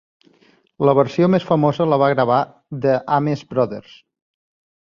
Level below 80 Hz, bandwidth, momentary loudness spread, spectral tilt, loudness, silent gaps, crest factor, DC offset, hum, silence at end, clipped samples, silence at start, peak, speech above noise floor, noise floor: -60 dBFS; 7.2 kHz; 7 LU; -8.5 dB/octave; -18 LUFS; none; 18 dB; under 0.1%; none; 1.1 s; under 0.1%; 0.8 s; -2 dBFS; 39 dB; -56 dBFS